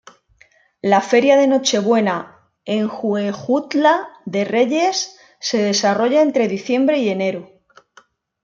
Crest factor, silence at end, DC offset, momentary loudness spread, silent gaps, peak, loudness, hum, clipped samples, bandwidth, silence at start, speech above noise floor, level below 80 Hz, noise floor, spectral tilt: 16 dB; 1 s; under 0.1%; 10 LU; none; -2 dBFS; -17 LUFS; none; under 0.1%; 7.6 kHz; 0.85 s; 38 dB; -68 dBFS; -55 dBFS; -4 dB/octave